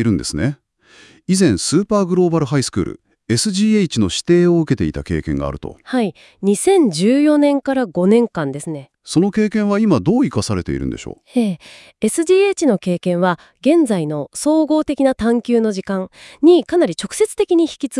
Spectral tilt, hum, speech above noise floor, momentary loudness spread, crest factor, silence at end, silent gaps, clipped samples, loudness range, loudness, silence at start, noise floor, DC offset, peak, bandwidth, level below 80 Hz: -5.5 dB/octave; none; 32 dB; 10 LU; 16 dB; 0 s; none; under 0.1%; 2 LU; -16 LUFS; 0 s; -48 dBFS; under 0.1%; -2 dBFS; 12 kHz; -44 dBFS